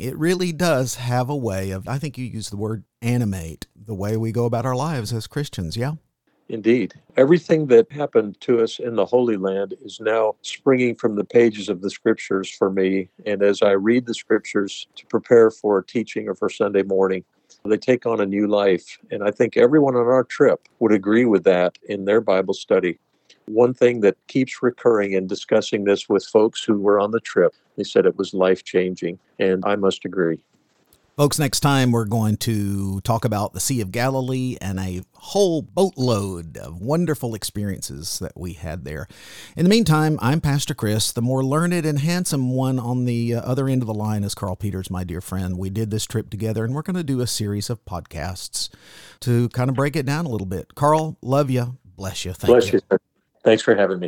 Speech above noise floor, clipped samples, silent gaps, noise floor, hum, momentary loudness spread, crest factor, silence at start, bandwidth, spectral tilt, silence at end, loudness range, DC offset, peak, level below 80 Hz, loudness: 40 dB; under 0.1%; none; -60 dBFS; none; 12 LU; 20 dB; 0 s; 18.5 kHz; -6 dB/octave; 0 s; 6 LU; under 0.1%; -2 dBFS; -50 dBFS; -21 LUFS